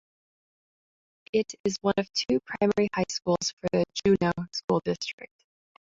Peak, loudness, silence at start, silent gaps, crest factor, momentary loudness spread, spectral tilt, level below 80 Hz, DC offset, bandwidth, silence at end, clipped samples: -10 dBFS; -27 LUFS; 1.35 s; 1.60-1.64 s, 3.53-3.57 s, 4.64-4.68 s, 5.13-5.18 s; 18 dB; 7 LU; -5 dB/octave; -60 dBFS; under 0.1%; 7.8 kHz; 0.7 s; under 0.1%